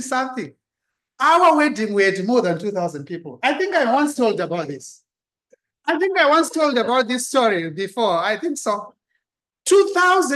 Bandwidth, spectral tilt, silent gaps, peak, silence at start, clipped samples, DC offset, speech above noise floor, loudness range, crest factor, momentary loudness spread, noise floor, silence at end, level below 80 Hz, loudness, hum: 12.5 kHz; -3.5 dB/octave; none; -4 dBFS; 0 s; under 0.1%; under 0.1%; 63 dB; 4 LU; 16 dB; 13 LU; -81 dBFS; 0 s; -72 dBFS; -19 LUFS; none